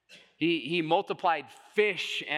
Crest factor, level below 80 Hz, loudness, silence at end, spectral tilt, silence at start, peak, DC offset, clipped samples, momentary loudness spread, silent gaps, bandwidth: 20 dB; -88 dBFS; -29 LUFS; 0 s; -4.5 dB/octave; 0.1 s; -10 dBFS; under 0.1%; under 0.1%; 5 LU; none; 12.5 kHz